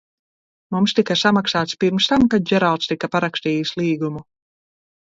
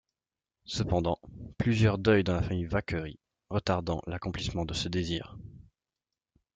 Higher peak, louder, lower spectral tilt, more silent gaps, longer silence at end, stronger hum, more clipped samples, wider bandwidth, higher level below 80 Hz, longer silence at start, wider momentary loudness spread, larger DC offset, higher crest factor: first, -4 dBFS vs -10 dBFS; first, -19 LUFS vs -30 LUFS; about the same, -5 dB/octave vs -6 dB/octave; neither; second, 0.8 s vs 0.95 s; neither; neither; second, 7.8 kHz vs 9.2 kHz; about the same, -52 dBFS vs -50 dBFS; about the same, 0.7 s vs 0.7 s; second, 6 LU vs 13 LU; neither; second, 16 dB vs 22 dB